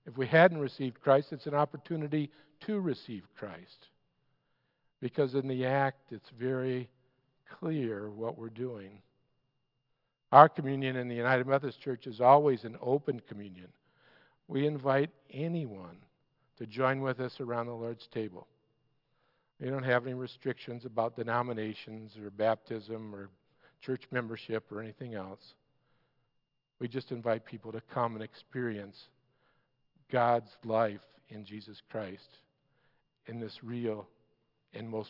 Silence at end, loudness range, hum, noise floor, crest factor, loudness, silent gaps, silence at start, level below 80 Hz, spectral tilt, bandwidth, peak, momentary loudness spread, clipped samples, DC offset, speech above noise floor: 0 s; 13 LU; none; -80 dBFS; 30 dB; -32 LUFS; none; 0.05 s; -84 dBFS; -5.5 dB/octave; 5.8 kHz; -4 dBFS; 19 LU; under 0.1%; under 0.1%; 48 dB